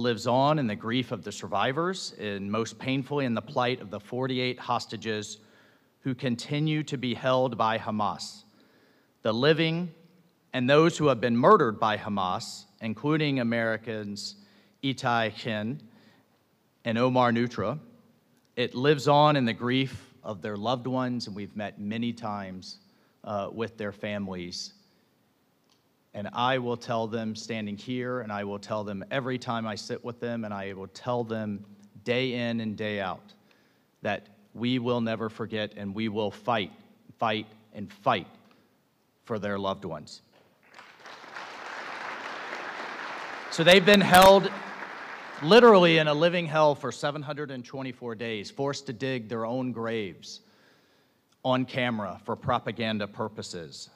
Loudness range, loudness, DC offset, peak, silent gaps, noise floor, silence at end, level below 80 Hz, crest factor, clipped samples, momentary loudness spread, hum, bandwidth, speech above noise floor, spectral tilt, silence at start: 13 LU; -27 LUFS; under 0.1%; -6 dBFS; none; -68 dBFS; 0.1 s; -62 dBFS; 22 dB; under 0.1%; 17 LU; none; 15.5 kHz; 42 dB; -5.5 dB/octave; 0 s